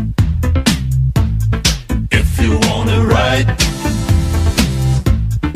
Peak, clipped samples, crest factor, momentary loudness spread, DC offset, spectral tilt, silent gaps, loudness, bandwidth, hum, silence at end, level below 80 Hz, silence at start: 0 dBFS; under 0.1%; 14 dB; 4 LU; under 0.1%; -5 dB/octave; none; -15 LUFS; 15.5 kHz; none; 0 s; -20 dBFS; 0 s